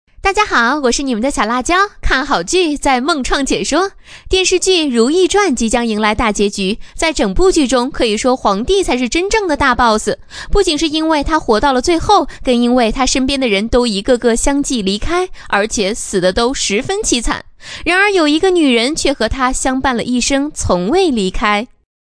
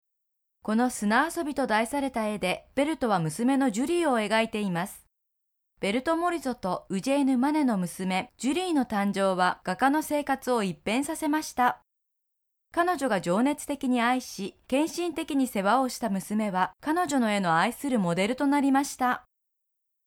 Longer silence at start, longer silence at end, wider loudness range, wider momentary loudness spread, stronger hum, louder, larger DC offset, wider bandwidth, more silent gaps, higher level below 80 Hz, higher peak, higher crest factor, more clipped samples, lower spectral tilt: second, 0.2 s vs 0.65 s; second, 0.4 s vs 0.85 s; about the same, 2 LU vs 2 LU; about the same, 5 LU vs 6 LU; neither; first, -14 LUFS vs -27 LUFS; neither; second, 11 kHz vs 17 kHz; neither; first, -28 dBFS vs -62 dBFS; first, 0 dBFS vs -10 dBFS; about the same, 14 dB vs 16 dB; neither; second, -3 dB/octave vs -5 dB/octave